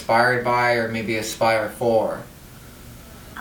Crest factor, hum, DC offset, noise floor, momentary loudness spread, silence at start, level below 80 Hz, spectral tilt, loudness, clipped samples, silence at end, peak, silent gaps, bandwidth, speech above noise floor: 16 dB; none; under 0.1%; -42 dBFS; 23 LU; 0 s; -50 dBFS; -4.5 dB/octave; -21 LUFS; under 0.1%; 0 s; -6 dBFS; none; over 20 kHz; 22 dB